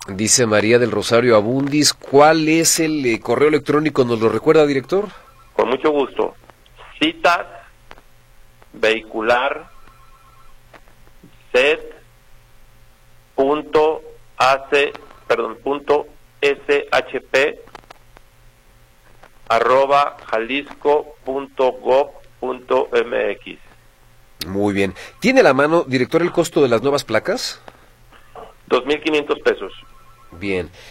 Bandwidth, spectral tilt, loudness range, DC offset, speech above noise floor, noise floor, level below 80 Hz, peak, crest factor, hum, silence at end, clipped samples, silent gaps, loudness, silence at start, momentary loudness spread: 16 kHz; -3.5 dB/octave; 8 LU; under 0.1%; 33 dB; -50 dBFS; -48 dBFS; 0 dBFS; 18 dB; none; 0 s; under 0.1%; none; -17 LUFS; 0 s; 12 LU